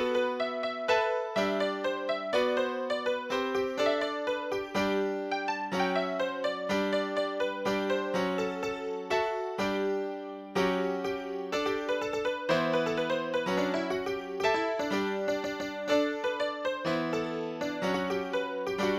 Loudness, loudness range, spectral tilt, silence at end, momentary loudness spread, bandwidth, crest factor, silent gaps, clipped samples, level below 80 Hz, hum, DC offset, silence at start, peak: -31 LUFS; 2 LU; -5 dB/octave; 0 s; 5 LU; 16 kHz; 16 dB; none; under 0.1%; -64 dBFS; none; under 0.1%; 0 s; -14 dBFS